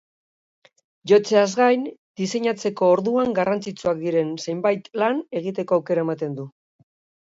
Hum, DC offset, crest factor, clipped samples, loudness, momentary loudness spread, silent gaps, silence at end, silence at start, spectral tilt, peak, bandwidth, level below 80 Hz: none; under 0.1%; 18 dB; under 0.1%; -22 LUFS; 11 LU; 1.98-2.15 s; 0.75 s; 1.05 s; -5.5 dB/octave; -4 dBFS; 8 kHz; -68 dBFS